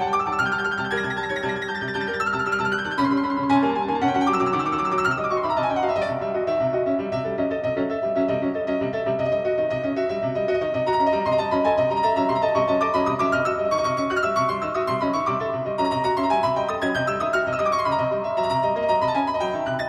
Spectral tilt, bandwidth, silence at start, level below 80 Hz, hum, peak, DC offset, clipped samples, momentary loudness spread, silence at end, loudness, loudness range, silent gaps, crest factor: -6 dB/octave; 11.5 kHz; 0 s; -54 dBFS; none; -8 dBFS; under 0.1%; under 0.1%; 4 LU; 0 s; -23 LUFS; 3 LU; none; 16 dB